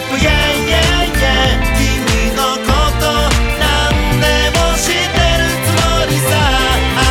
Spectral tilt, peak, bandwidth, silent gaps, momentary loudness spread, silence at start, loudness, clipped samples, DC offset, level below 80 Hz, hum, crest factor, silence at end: -4 dB/octave; 0 dBFS; 18 kHz; none; 2 LU; 0 s; -13 LUFS; under 0.1%; under 0.1%; -18 dBFS; none; 12 dB; 0 s